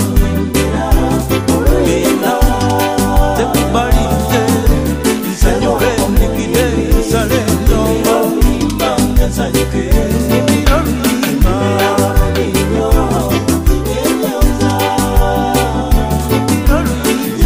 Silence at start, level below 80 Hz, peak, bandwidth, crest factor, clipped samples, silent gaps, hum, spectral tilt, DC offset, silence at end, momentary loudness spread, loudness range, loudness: 0 s; -16 dBFS; 0 dBFS; 16 kHz; 12 dB; under 0.1%; none; none; -5.5 dB/octave; 0.2%; 0 s; 2 LU; 1 LU; -13 LUFS